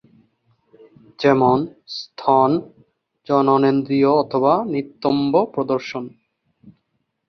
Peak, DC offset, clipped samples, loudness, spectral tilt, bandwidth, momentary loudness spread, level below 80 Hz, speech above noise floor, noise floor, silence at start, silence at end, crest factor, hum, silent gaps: -2 dBFS; under 0.1%; under 0.1%; -18 LUFS; -7.5 dB/octave; 6.4 kHz; 13 LU; -62 dBFS; 54 dB; -72 dBFS; 1.2 s; 0.6 s; 18 dB; none; none